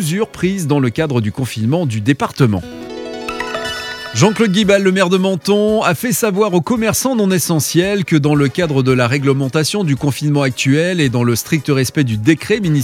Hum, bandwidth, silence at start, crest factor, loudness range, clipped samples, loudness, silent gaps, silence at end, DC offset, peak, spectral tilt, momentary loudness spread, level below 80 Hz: none; 17 kHz; 0 s; 14 dB; 4 LU; under 0.1%; -15 LUFS; none; 0 s; under 0.1%; 0 dBFS; -5.5 dB/octave; 8 LU; -46 dBFS